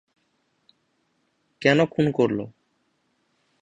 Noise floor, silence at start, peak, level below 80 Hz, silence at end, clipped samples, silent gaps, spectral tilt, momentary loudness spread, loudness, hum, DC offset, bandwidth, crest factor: -70 dBFS; 1.6 s; -4 dBFS; -62 dBFS; 1.15 s; under 0.1%; none; -6.5 dB/octave; 11 LU; -22 LUFS; none; under 0.1%; 8.8 kHz; 22 dB